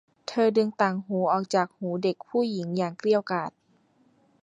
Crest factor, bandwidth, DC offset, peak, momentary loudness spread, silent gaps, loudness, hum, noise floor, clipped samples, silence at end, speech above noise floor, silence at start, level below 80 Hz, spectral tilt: 20 dB; 10 kHz; under 0.1%; -8 dBFS; 7 LU; none; -26 LUFS; none; -64 dBFS; under 0.1%; 0.95 s; 39 dB; 0.3 s; -74 dBFS; -6.5 dB/octave